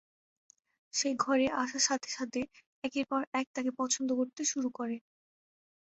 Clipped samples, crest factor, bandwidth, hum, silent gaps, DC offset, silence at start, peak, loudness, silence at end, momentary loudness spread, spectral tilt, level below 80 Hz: under 0.1%; 20 dB; 8.4 kHz; none; 2.66-2.82 s, 3.27-3.32 s, 3.47-3.54 s; under 0.1%; 0.95 s; -14 dBFS; -33 LUFS; 0.95 s; 10 LU; -1.5 dB/octave; -72 dBFS